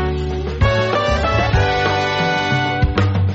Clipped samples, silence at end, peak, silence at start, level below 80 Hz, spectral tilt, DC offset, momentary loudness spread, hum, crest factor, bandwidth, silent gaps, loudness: under 0.1%; 0 s; -4 dBFS; 0 s; -26 dBFS; -4.5 dB/octave; under 0.1%; 3 LU; none; 12 dB; 7.8 kHz; none; -17 LUFS